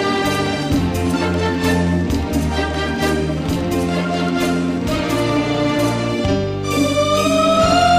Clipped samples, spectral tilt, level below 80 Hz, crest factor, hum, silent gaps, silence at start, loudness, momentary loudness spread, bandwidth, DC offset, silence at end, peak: under 0.1%; -5.5 dB/octave; -32 dBFS; 12 dB; none; none; 0 s; -18 LUFS; 5 LU; 15.5 kHz; under 0.1%; 0 s; -4 dBFS